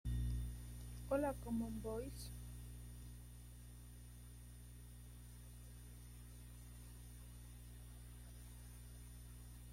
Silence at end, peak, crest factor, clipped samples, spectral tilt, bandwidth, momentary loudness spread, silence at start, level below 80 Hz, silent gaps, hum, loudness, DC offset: 0 s; -28 dBFS; 22 dB; under 0.1%; -6.5 dB/octave; 16.5 kHz; 15 LU; 0.05 s; -54 dBFS; none; 60 Hz at -55 dBFS; -51 LUFS; under 0.1%